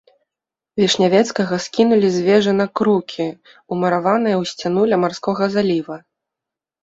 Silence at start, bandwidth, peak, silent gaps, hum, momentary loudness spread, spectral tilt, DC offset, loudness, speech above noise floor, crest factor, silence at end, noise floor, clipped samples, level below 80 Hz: 0.75 s; 8 kHz; -2 dBFS; none; none; 11 LU; -5.5 dB/octave; under 0.1%; -17 LUFS; 69 dB; 16 dB; 0.85 s; -86 dBFS; under 0.1%; -60 dBFS